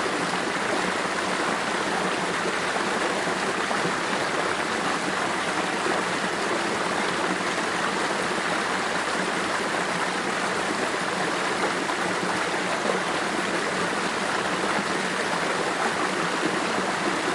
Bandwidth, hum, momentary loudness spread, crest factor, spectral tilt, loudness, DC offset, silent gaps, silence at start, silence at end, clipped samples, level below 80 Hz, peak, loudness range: 11.5 kHz; none; 1 LU; 16 dB; -3 dB/octave; -25 LUFS; under 0.1%; none; 0 s; 0 s; under 0.1%; -62 dBFS; -10 dBFS; 0 LU